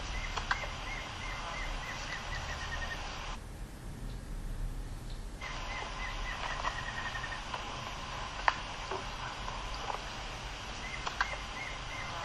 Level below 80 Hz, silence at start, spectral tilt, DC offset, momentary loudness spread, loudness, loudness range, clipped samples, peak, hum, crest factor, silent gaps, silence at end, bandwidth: -44 dBFS; 0 s; -3 dB/octave; under 0.1%; 10 LU; -39 LUFS; 5 LU; under 0.1%; -8 dBFS; none; 30 dB; none; 0 s; 12.5 kHz